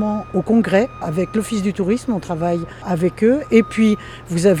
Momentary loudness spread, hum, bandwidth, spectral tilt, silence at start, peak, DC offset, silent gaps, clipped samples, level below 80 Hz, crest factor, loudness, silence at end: 8 LU; none; 13.5 kHz; -6.5 dB/octave; 0 s; -2 dBFS; under 0.1%; none; under 0.1%; -44 dBFS; 16 dB; -18 LUFS; 0 s